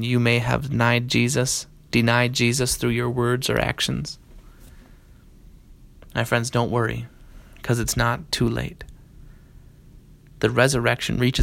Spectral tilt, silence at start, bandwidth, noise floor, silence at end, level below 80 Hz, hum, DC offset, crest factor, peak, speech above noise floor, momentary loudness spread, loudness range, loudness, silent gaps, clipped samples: -4.5 dB/octave; 0 s; 16.5 kHz; -49 dBFS; 0 s; -42 dBFS; none; under 0.1%; 20 dB; -2 dBFS; 27 dB; 11 LU; 7 LU; -22 LUFS; none; under 0.1%